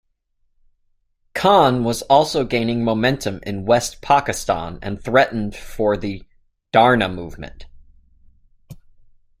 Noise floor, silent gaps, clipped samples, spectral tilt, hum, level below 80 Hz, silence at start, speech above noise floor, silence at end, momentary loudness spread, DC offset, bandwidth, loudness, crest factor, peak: -66 dBFS; none; under 0.1%; -5 dB/octave; none; -44 dBFS; 1.35 s; 48 dB; 0.65 s; 15 LU; under 0.1%; 16 kHz; -18 LUFS; 20 dB; 0 dBFS